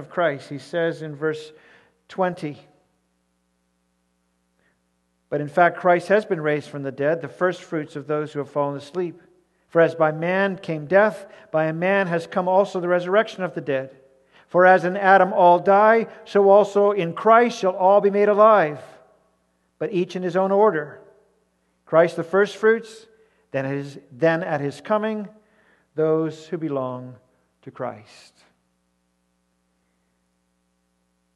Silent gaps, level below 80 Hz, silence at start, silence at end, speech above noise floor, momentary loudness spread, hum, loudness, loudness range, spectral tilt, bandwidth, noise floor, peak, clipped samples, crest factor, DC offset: none; -74 dBFS; 0 s; 3.35 s; 49 dB; 16 LU; 60 Hz at -55 dBFS; -20 LUFS; 17 LU; -6.5 dB/octave; 11.5 kHz; -69 dBFS; -2 dBFS; under 0.1%; 20 dB; under 0.1%